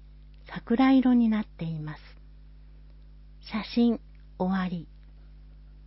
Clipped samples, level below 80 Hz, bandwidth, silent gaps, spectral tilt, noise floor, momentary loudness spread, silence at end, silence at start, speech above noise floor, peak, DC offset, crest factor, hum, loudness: under 0.1%; -50 dBFS; 5.8 kHz; none; -10.5 dB/octave; -49 dBFS; 20 LU; 0.2 s; 0.45 s; 24 dB; -14 dBFS; under 0.1%; 16 dB; 50 Hz at -50 dBFS; -26 LUFS